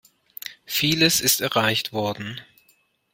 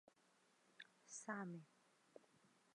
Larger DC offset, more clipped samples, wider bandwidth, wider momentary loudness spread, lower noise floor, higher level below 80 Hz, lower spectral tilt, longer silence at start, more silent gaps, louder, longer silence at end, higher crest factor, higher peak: neither; neither; first, 16.5 kHz vs 11 kHz; about the same, 19 LU vs 19 LU; second, -63 dBFS vs -78 dBFS; first, -58 dBFS vs under -90 dBFS; second, -2.5 dB/octave vs -4.5 dB/octave; second, 0.45 s vs 0.65 s; neither; first, -20 LUFS vs -54 LUFS; first, 0.7 s vs 0.2 s; about the same, 20 dB vs 24 dB; first, -4 dBFS vs -34 dBFS